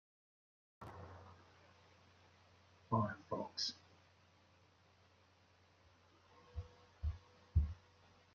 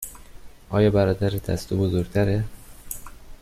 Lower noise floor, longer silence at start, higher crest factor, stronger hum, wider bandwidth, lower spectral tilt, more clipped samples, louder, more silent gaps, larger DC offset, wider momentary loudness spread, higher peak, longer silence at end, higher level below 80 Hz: first, -71 dBFS vs -42 dBFS; first, 0.8 s vs 0 s; first, 24 dB vs 16 dB; neither; second, 7.2 kHz vs 15.5 kHz; second, -5 dB/octave vs -7 dB/octave; neither; second, -44 LUFS vs -23 LUFS; neither; neither; first, 26 LU vs 17 LU; second, -22 dBFS vs -8 dBFS; first, 0.6 s vs 0.05 s; second, -54 dBFS vs -42 dBFS